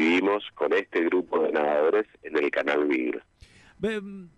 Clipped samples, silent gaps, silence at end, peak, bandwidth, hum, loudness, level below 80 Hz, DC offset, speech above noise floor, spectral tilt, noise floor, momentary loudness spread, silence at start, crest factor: under 0.1%; none; 0.1 s; -12 dBFS; 9.8 kHz; none; -26 LUFS; -64 dBFS; under 0.1%; 28 dB; -5.5 dB/octave; -54 dBFS; 8 LU; 0 s; 14 dB